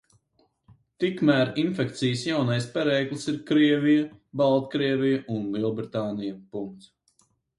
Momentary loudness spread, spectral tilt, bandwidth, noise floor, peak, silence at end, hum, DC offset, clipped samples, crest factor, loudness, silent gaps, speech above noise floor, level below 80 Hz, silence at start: 12 LU; -6.5 dB/octave; 11.5 kHz; -68 dBFS; -8 dBFS; 0.8 s; none; under 0.1%; under 0.1%; 18 dB; -25 LUFS; none; 44 dB; -66 dBFS; 1 s